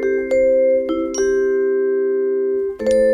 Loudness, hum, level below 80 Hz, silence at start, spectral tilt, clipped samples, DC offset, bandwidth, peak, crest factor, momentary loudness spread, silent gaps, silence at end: -18 LUFS; none; -48 dBFS; 0 s; -4.5 dB/octave; under 0.1%; under 0.1%; 9.8 kHz; -6 dBFS; 10 dB; 5 LU; none; 0 s